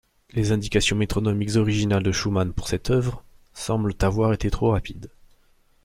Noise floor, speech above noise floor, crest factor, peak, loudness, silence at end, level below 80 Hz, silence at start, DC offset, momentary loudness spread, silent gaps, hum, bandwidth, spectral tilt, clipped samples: -59 dBFS; 37 dB; 18 dB; -6 dBFS; -23 LUFS; 0.75 s; -36 dBFS; 0.35 s; under 0.1%; 9 LU; none; none; 15.5 kHz; -5.5 dB/octave; under 0.1%